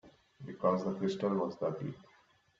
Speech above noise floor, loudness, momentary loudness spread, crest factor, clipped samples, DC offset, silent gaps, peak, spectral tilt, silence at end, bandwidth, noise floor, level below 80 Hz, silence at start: 34 dB; -35 LUFS; 18 LU; 20 dB; under 0.1%; under 0.1%; none; -16 dBFS; -8 dB/octave; 0.55 s; 7.6 kHz; -68 dBFS; -74 dBFS; 0.05 s